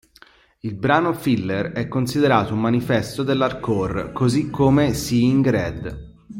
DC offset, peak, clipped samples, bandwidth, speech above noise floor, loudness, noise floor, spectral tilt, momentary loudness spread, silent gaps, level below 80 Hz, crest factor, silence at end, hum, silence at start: under 0.1%; -2 dBFS; under 0.1%; 16.5 kHz; 32 dB; -20 LUFS; -52 dBFS; -6.5 dB/octave; 9 LU; none; -44 dBFS; 18 dB; 0 s; none; 0.65 s